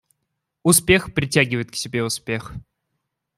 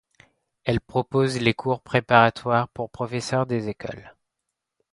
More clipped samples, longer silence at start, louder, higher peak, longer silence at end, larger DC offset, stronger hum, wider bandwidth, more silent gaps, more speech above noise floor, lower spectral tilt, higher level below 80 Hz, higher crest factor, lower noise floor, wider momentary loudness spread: neither; about the same, 0.65 s vs 0.65 s; first, -20 LUFS vs -23 LUFS; about the same, -2 dBFS vs -2 dBFS; about the same, 0.75 s vs 0.85 s; neither; neither; first, 15.5 kHz vs 11.5 kHz; neither; about the same, 57 dB vs 59 dB; second, -3.5 dB/octave vs -6 dB/octave; first, -46 dBFS vs -54 dBFS; about the same, 20 dB vs 22 dB; second, -77 dBFS vs -82 dBFS; about the same, 13 LU vs 14 LU